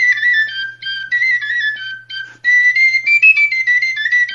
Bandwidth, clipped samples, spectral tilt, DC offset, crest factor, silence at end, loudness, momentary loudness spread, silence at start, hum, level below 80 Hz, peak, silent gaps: 7.4 kHz; under 0.1%; 2 dB/octave; under 0.1%; 14 dB; 0 s; -11 LUFS; 15 LU; 0 s; none; -72 dBFS; -2 dBFS; none